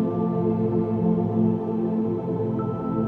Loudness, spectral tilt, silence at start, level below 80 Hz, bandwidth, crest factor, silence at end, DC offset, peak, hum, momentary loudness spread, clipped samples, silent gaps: -24 LUFS; -12 dB/octave; 0 s; -54 dBFS; 3.7 kHz; 12 dB; 0 s; under 0.1%; -12 dBFS; none; 4 LU; under 0.1%; none